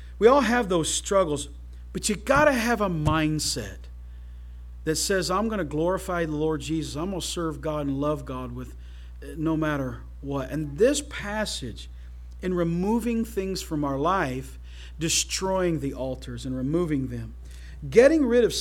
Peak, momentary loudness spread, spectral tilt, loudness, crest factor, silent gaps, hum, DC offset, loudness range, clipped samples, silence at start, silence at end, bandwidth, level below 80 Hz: -2 dBFS; 22 LU; -4.5 dB/octave; -25 LUFS; 22 dB; none; 60 Hz at -40 dBFS; under 0.1%; 5 LU; under 0.1%; 0 s; 0 s; 17 kHz; -40 dBFS